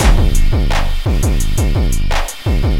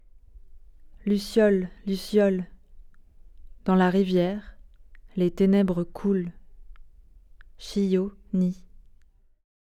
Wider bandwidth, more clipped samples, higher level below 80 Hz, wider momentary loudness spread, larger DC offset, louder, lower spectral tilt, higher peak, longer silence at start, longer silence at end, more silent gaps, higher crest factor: first, 16 kHz vs 13.5 kHz; neither; first, -12 dBFS vs -48 dBFS; second, 4 LU vs 14 LU; neither; first, -17 LUFS vs -25 LUFS; second, -5 dB/octave vs -7.5 dB/octave; first, -2 dBFS vs -8 dBFS; second, 0 s vs 0.35 s; second, 0 s vs 1.1 s; neither; second, 10 dB vs 20 dB